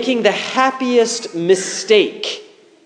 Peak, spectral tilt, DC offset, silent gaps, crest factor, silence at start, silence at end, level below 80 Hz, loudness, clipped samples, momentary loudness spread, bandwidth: 0 dBFS; -3 dB/octave; under 0.1%; none; 16 dB; 0 s; 0.4 s; -72 dBFS; -16 LUFS; under 0.1%; 9 LU; 10.5 kHz